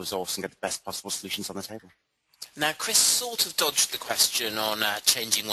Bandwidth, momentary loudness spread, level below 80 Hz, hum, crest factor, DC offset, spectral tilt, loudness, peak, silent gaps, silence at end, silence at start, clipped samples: 13 kHz; 15 LU; -68 dBFS; none; 24 dB; under 0.1%; 0 dB/octave; -24 LUFS; -4 dBFS; none; 0 s; 0 s; under 0.1%